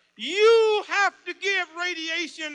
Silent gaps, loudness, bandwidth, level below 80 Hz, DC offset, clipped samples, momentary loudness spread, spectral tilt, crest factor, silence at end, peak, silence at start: none; -23 LUFS; 9.8 kHz; -84 dBFS; under 0.1%; under 0.1%; 10 LU; -0.5 dB/octave; 16 dB; 0 s; -8 dBFS; 0.2 s